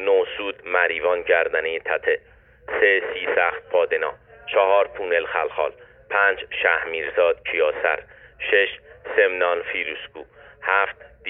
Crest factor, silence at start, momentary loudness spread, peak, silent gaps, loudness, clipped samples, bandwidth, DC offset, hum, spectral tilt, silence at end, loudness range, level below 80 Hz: 18 dB; 0 s; 10 LU; -4 dBFS; none; -22 LUFS; under 0.1%; 3.9 kHz; under 0.1%; none; -6.5 dB/octave; 0 s; 1 LU; -58 dBFS